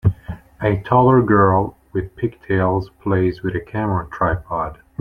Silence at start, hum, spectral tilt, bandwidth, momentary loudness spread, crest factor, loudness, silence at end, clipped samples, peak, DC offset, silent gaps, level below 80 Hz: 0.05 s; none; -10 dB/octave; 5 kHz; 13 LU; 16 dB; -19 LUFS; 0.25 s; under 0.1%; -2 dBFS; under 0.1%; none; -40 dBFS